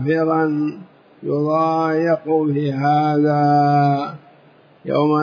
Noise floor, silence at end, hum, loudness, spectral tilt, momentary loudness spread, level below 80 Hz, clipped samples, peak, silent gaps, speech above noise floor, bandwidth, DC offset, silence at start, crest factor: -50 dBFS; 0 s; none; -18 LUFS; -9 dB/octave; 10 LU; -72 dBFS; under 0.1%; -6 dBFS; none; 33 dB; 5.4 kHz; under 0.1%; 0 s; 12 dB